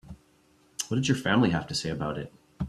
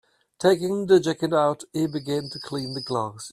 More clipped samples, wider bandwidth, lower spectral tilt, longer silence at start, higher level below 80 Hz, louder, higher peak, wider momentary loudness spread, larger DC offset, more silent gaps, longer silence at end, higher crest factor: neither; about the same, 14 kHz vs 14 kHz; about the same, -5 dB/octave vs -5.5 dB/octave; second, 0.05 s vs 0.4 s; first, -54 dBFS vs -64 dBFS; second, -28 LUFS vs -24 LUFS; second, -10 dBFS vs -6 dBFS; first, 15 LU vs 10 LU; neither; neither; about the same, 0 s vs 0 s; about the same, 20 dB vs 18 dB